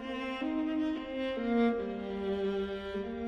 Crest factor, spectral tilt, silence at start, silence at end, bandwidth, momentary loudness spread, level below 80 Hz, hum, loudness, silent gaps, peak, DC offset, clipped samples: 14 dB; -7 dB/octave; 0 s; 0 s; 8.4 kHz; 8 LU; -56 dBFS; none; -34 LUFS; none; -18 dBFS; under 0.1%; under 0.1%